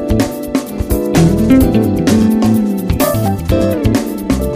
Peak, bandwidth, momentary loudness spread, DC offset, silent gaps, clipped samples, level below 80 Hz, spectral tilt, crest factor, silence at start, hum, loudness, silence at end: 0 dBFS; 15.5 kHz; 7 LU; under 0.1%; none; under 0.1%; -24 dBFS; -6.5 dB/octave; 12 dB; 0 s; none; -13 LUFS; 0 s